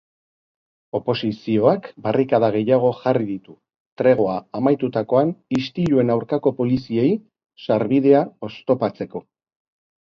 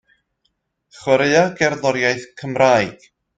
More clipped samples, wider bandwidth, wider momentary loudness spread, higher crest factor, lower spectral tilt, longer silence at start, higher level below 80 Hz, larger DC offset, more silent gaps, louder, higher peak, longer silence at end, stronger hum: neither; second, 7 kHz vs 9.2 kHz; about the same, 11 LU vs 12 LU; about the same, 20 dB vs 18 dB; first, -8.5 dB/octave vs -4.5 dB/octave; about the same, 0.95 s vs 1 s; about the same, -58 dBFS vs -56 dBFS; neither; first, 3.76-3.97 s vs none; second, -20 LUFS vs -17 LUFS; about the same, -2 dBFS vs 0 dBFS; first, 0.9 s vs 0.45 s; neither